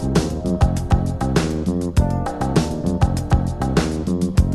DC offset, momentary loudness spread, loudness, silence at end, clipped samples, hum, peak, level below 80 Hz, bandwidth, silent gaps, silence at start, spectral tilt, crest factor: 0.6%; 3 LU; -20 LUFS; 0 s; under 0.1%; none; -2 dBFS; -24 dBFS; 13 kHz; none; 0 s; -7 dB/octave; 16 dB